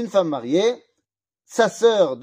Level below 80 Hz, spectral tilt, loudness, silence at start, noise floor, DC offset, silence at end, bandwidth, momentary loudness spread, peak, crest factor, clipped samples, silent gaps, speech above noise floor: -74 dBFS; -4.5 dB/octave; -20 LUFS; 0 s; -79 dBFS; under 0.1%; 0 s; 15.5 kHz; 9 LU; -4 dBFS; 16 dB; under 0.1%; none; 59 dB